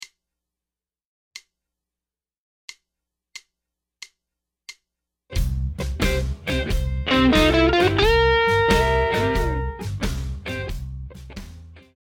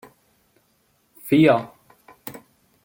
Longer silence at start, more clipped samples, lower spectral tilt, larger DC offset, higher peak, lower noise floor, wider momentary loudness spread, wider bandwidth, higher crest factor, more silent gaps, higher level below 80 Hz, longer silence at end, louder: second, 0 s vs 1.25 s; neither; second, -5.5 dB/octave vs -7 dB/octave; neither; about the same, -6 dBFS vs -4 dBFS; first, under -90 dBFS vs -65 dBFS; about the same, 25 LU vs 24 LU; about the same, 17.5 kHz vs 17 kHz; about the same, 18 dB vs 22 dB; first, 1.05-1.31 s, 2.38-2.68 s vs none; first, -30 dBFS vs -64 dBFS; second, 0.25 s vs 0.45 s; second, -21 LUFS vs -18 LUFS